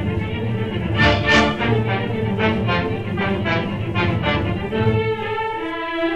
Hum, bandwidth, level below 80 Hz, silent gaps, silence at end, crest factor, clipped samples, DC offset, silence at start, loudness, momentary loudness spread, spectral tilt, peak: none; 8.6 kHz; -36 dBFS; none; 0 s; 16 dB; under 0.1%; under 0.1%; 0 s; -20 LUFS; 8 LU; -6.5 dB/octave; -4 dBFS